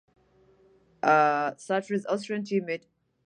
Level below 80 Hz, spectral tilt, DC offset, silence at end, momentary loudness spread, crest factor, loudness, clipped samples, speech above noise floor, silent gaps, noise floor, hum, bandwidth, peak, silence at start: -78 dBFS; -5.5 dB/octave; under 0.1%; 0.5 s; 9 LU; 22 dB; -27 LUFS; under 0.1%; 35 dB; none; -62 dBFS; none; 10.5 kHz; -8 dBFS; 1.05 s